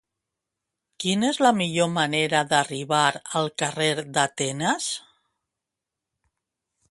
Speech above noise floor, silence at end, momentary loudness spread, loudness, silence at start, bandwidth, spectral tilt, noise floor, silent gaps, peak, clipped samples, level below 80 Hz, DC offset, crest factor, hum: 63 dB; 1.9 s; 7 LU; -23 LUFS; 1 s; 11.5 kHz; -3.5 dB/octave; -86 dBFS; none; -4 dBFS; under 0.1%; -68 dBFS; under 0.1%; 20 dB; none